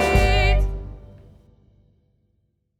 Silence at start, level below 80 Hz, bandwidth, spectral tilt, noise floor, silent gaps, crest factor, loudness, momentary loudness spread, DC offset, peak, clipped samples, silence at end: 0 s; -26 dBFS; 13.5 kHz; -5.5 dB/octave; -69 dBFS; none; 18 dB; -20 LUFS; 23 LU; under 0.1%; -6 dBFS; under 0.1%; 1.8 s